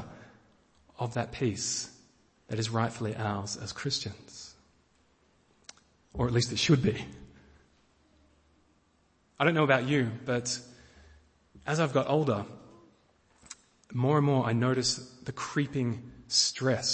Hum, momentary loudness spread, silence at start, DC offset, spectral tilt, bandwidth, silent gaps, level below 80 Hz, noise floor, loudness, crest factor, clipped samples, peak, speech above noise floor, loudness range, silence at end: none; 20 LU; 0 s; under 0.1%; -4.5 dB/octave; 8.8 kHz; none; -58 dBFS; -69 dBFS; -29 LUFS; 24 dB; under 0.1%; -8 dBFS; 39 dB; 6 LU; 0 s